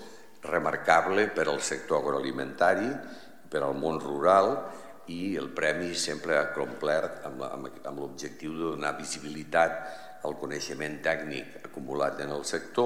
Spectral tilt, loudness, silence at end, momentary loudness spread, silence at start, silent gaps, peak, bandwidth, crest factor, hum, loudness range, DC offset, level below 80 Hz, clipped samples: -3.5 dB/octave; -29 LUFS; 0 s; 15 LU; 0 s; none; -6 dBFS; 16 kHz; 22 dB; none; 5 LU; 0.4%; -66 dBFS; under 0.1%